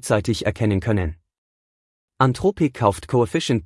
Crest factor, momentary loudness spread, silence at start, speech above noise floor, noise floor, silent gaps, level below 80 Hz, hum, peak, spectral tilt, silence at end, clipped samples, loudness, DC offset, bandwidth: 18 dB; 4 LU; 0.05 s; over 70 dB; under -90 dBFS; 1.38-2.08 s; -44 dBFS; none; -2 dBFS; -6 dB/octave; 0 s; under 0.1%; -21 LUFS; under 0.1%; 12 kHz